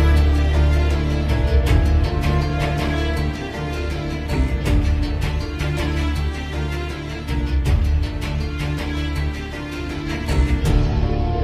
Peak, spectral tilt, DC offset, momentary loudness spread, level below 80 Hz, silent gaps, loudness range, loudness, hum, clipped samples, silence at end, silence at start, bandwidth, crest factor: -4 dBFS; -6.5 dB/octave; under 0.1%; 8 LU; -20 dBFS; none; 4 LU; -21 LUFS; none; under 0.1%; 0 s; 0 s; 12.5 kHz; 16 dB